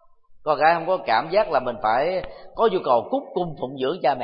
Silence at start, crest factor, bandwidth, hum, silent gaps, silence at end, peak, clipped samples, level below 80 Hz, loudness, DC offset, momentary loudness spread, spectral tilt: 0.3 s; 18 dB; 5.4 kHz; none; none; 0 s; -4 dBFS; under 0.1%; -52 dBFS; -22 LUFS; under 0.1%; 10 LU; -10 dB/octave